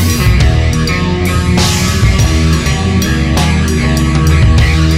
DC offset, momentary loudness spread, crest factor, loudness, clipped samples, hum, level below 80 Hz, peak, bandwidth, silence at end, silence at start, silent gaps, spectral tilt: under 0.1%; 3 LU; 10 dB; -11 LUFS; under 0.1%; none; -14 dBFS; 0 dBFS; 16 kHz; 0 s; 0 s; none; -5 dB/octave